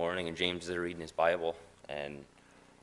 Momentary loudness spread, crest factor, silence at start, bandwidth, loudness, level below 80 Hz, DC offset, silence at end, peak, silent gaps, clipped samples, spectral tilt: 13 LU; 22 dB; 0 s; 11.5 kHz; -35 LUFS; -66 dBFS; under 0.1%; 0.6 s; -12 dBFS; none; under 0.1%; -4.5 dB/octave